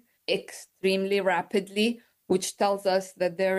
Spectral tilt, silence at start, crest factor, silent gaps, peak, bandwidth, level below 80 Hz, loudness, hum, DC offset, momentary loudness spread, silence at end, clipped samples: -4 dB/octave; 0.3 s; 14 dB; none; -12 dBFS; 12.5 kHz; -74 dBFS; -27 LUFS; none; under 0.1%; 6 LU; 0 s; under 0.1%